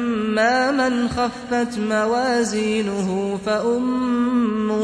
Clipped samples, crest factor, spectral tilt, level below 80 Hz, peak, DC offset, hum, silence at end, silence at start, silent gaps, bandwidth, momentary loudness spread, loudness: under 0.1%; 14 dB; -5 dB/octave; -50 dBFS; -6 dBFS; under 0.1%; none; 0 s; 0 s; none; 11 kHz; 5 LU; -20 LUFS